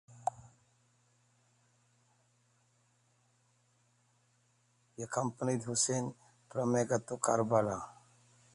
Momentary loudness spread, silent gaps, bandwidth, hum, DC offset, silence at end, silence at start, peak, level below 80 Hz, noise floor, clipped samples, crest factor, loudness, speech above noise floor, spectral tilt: 12 LU; none; 11.5 kHz; none; under 0.1%; 0.65 s; 0.1 s; -14 dBFS; -72 dBFS; -73 dBFS; under 0.1%; 24 dB; -34 LUFS; 39 dB; -4.5 dB/octave